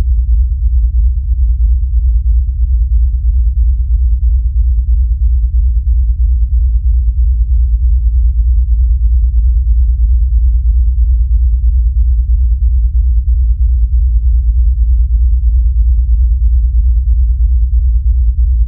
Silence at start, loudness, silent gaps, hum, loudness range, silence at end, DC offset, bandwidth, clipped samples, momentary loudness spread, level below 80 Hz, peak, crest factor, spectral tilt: 0 s; -13 LUFS; none; none; 1 LU; 0 s; under 0.1%; 0.3 kHz; under 0.1%; 1 LU; -10 dBFS; -2 dBFS; 8 dB; -14 dB/octave